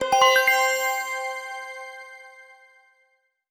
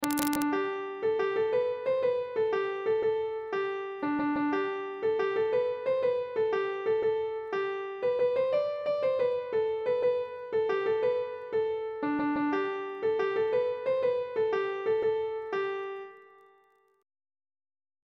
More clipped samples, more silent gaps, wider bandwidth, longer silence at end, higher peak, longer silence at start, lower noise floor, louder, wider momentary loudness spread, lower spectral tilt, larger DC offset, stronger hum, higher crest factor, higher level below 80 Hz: neither; neither; first, over 20 kHz vs 16 kHz; second, 1.1 s vs 1.8 s; about the same, -4 dBFS vs -6 dBFS; about the same, 0 s vs 0 s; about the same, -68 dBFS vs -66 dBFS; first, -21 LUFS vs -30 LUFS; first, 24 LU vs 5 LU; second, 0.5 dB/octave vs -4.5 dB/octave; neither; neither; about the same, 20 dB vs 24 dB; about the same, -66 dBFS vs -70 dBFS